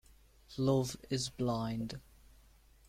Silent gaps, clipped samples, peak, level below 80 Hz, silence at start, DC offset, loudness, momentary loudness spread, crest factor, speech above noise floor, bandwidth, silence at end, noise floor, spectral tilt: none; under 0.1%; -18 dBFS; -60 dBFS; 0.5 s; under 0.1%; -36 LUFS; 14 LU; 18 dB; 28 dB; 16 kHz; 0.9 s; -63 dBFS; -6 dB/octave